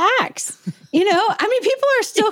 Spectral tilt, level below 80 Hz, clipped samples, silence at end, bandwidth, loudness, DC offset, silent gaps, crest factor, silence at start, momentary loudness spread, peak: -3 dB/octave; -72 dBFS; under 0.1%; 0 s; 17 kHz; -18 LUFS; under 0.1%; none; 14 dB; 0 s; 10 LU; -4 dBFS